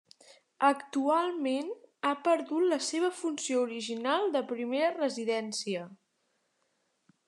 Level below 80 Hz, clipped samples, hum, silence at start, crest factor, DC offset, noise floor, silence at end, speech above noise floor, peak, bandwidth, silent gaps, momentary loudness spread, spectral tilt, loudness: under -90 dBFS; under 0.1%; none; 0.6 s; 20 dB; under 0.1%; -77 dBFS; 1.35 s; 47 dB; -12 dBFS; 12 kHz; none; 6 LU; -3 dB/octave; -31 LUFS